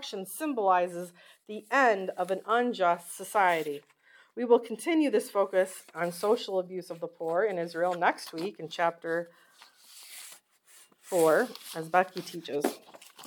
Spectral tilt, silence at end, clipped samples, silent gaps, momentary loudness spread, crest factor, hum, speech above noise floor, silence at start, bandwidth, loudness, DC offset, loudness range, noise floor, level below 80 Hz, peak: -4 dB/octave; 0 s; under 0.1%; none; 18 LU; 20 dB; none; 30 dB; 0 s; 19 kHz; -29 LUFS; under 0.1%; 4 LU; -59 dBFS; -90 dBFS; -8 dBFS